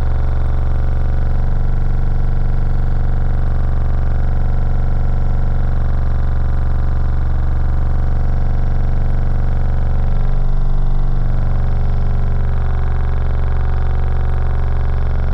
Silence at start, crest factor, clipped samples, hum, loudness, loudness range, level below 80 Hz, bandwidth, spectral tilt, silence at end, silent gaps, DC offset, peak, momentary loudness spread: 0 s; 8 dB; under 0.1%; none; -20 LUFS; 0 LU; -14 dBFS; 3.7 kHz; -9.5 dB/octave; 0 s; none; under 0.1%; -4 dBFS; 1 LU